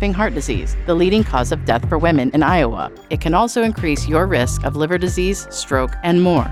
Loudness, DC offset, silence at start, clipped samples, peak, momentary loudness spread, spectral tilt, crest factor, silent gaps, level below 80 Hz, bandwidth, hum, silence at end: -18 LUFS; under 0.1%; 0 s; under 0.1%; -2 dBFS; 7 LU; -5.5 dB/octave; 14 dB; none; -26 dBFS; 14.5 kHz; none; 0 s